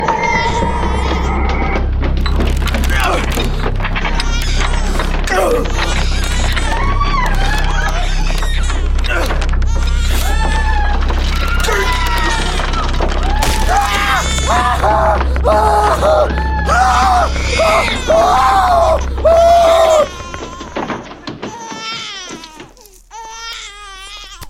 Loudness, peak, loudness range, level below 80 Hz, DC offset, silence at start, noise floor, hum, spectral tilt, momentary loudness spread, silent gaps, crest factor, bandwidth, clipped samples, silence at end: -14 LUFS; 0 dBFS; 6 LU; -16 dBFS; under 0.1%; 0 s; -40 dBFS; none; -4.5 dB/octave; 15 LU; none; 14 dB; 16 kHz; under 0.1%; 0 s